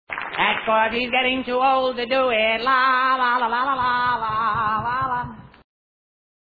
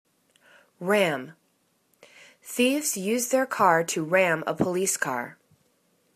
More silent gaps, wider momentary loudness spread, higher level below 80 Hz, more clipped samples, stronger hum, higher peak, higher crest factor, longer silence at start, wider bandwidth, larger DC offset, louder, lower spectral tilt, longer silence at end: neither; second, 5 LU vs 13 LU; first, -52 dBFS vs -68 dBFS; neither; neither; about the same, -6 dBFS vs -6 dBFS; about the same, 16 dB vs 20 dB; second, 0.1 s vs 0.8 s; second, 4.9 kHz vs 14 kHz; neither; first, -20 LUFS vs -24 LUFS; first, -6.5 dB/octave vs -3.5 dB/octave; first, 1.1 s vs 0.85 s